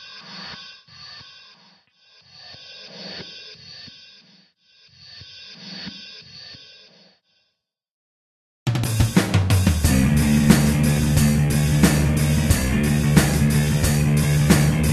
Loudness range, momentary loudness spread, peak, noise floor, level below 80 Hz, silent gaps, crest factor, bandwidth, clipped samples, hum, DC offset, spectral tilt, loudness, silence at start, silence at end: 21 LU; 22 LU; 0 dBFS; -76 dBFS; -32 dBFS; 7.91-8.66 s; 20 dB; 13.5 kHz; under 0.1%; none; under 0.1%; -5.5 dB/octave; -18 LUFS; 0 s; 0 s